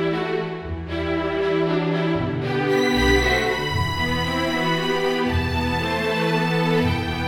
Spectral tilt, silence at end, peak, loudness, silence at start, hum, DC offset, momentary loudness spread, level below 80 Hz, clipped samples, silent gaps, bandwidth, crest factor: -5.5 dB/octave; 0 s; -6 dBFS; -21 LUFS; 0 s; none; under 0.1%; 6 LU; -36 dBFS; under 0.1%; none; 17 kHz; 16 dB